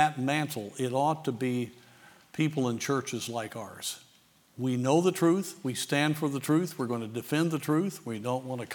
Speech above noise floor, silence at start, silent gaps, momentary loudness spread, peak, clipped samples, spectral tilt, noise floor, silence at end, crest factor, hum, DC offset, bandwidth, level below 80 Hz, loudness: 33 dB; 0 s; none; 10 LU; -8 dBFS; under 0.1%; -5.5 dB/octave; -62 dBFS; 0 s; 22 dB; none; under 0.1%; over 20 kHz; -78 dBFS; -30 LUFS